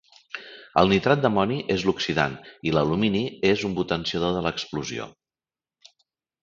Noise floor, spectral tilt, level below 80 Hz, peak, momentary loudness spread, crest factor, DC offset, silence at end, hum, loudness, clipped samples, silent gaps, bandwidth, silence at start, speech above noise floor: under -90 dBFS; -5.5 dB/octave; -50 dBFS; -4 dBFS; 15 LU; 22 dB; under 0.1%; 1.35 s; none; -24 LUFS; under 0.1%; none; 7.6 kHz; 0.35 s; over 67 dB